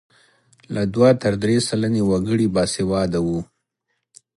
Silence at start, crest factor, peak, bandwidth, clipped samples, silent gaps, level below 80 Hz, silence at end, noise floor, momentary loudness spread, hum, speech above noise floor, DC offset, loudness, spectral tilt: 0.7 s; 18 dB; -2 dBFS; 11.5 kHz; under 0.1%; none; -46 dBFS; 0.95 s; -75 dBFS; 9 LU; none; 56 dB; under 0.1%; -20 LUFS; -6 dB/octave